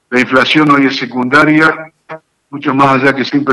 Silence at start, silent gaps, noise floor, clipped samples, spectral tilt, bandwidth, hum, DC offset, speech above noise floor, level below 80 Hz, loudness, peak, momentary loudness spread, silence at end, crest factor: 0.1 s; none; -32 dBFS; under 0.1%; -5.5 dB/octave; 11.5 kHz; none; under 0.1%; 22 dB; -52 dBFS; -10 LUFS; 0 dBFS; 12 LU; 0 s; 10 dB